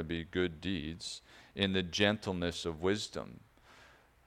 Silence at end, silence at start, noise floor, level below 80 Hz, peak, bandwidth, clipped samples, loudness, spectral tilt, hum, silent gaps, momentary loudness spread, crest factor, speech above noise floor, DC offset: 0.4 s; 0 s; -61 dBFS; -58 dBFS; -12 dBFS; 14.5 kHz; under 0.1%; -35 LUFS; -4.5 dB/octave; none; none; 14 LU; 24 dB; 26 dB; under 0.1%